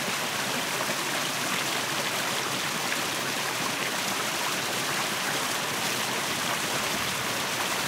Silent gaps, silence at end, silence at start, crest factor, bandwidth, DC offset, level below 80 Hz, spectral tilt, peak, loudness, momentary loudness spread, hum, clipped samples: none; 0 s; 0 s; 16 dB; 16 kHz; under 0.1%; -68 dBFS; -1.5 dB/octave; -12 dBFS; -27 LUFS; 1 LU; none; under 0.1%